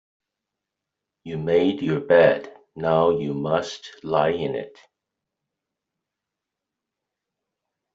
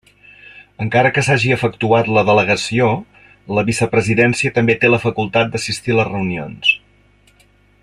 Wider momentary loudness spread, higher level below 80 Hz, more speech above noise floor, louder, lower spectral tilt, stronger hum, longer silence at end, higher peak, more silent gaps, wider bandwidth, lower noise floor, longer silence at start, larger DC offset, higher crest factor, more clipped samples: first, 18 LU vs 8 LU; second, -62 dBFS vs -50 dBFS; first, 64 dB vs 37 dB; second, -22 LUFS vs -16 LUFS; about the same, -5 dB/octave vs -5 dB/octave; second, none vs 50 Hz at -45 dBFS; first, 3.25 s vs 1.05 s; second, -4 dBFS vs 0 dBFS; neither; second, 7.8 kHz vs 12.5 kHz; first, -85 dBFS vs -53 dBFS; first, 1.25 s vs 0.55 s; neither; first, 22 dB vs 16 dB; neither